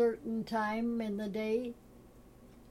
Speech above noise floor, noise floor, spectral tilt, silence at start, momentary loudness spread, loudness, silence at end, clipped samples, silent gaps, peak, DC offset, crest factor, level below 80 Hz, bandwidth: 23 dB; -57 dBFS; -6.5 dB/octave; 0 s; 7 LU; -35 LUFS; 0 s; under 0.1%; none; -20 dBFS; under 0.1%; 14 dB; -62 dBFS; 14.5 kHz